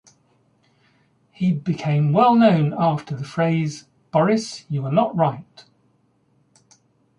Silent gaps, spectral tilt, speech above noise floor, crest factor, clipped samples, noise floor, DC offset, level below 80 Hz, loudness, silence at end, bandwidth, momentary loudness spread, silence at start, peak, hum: none; -7.5 dB/octave; 44 dB; 18 dB; under 0.1%; -63 dBFS; under 0.1%; -64 dBFS; -20 LUFS; 1.75 s; 10.5 kHz; 12 LU; 1.4 s; -4 dBFS; none